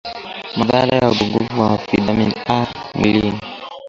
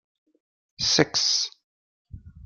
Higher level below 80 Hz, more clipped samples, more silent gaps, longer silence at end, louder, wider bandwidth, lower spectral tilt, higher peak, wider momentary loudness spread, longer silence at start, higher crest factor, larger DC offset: first, -42 dBFS vs -56 dBFS; neither; second, none vs 1.64-2.05 s; about the same, 0 s vs 0 s; first, -17 LUFS vs -22 LUFS; second, 7.6 kHz vs 12 kHz; first, -6.5 dB/octave vs -2 dB/octave; about the same, 0 dBFS vs -2 dBFS; first, 12 LU vs 7 LU; second, 0.05 s vs 0.8 s; second, 18 dB vs 26 dB; neither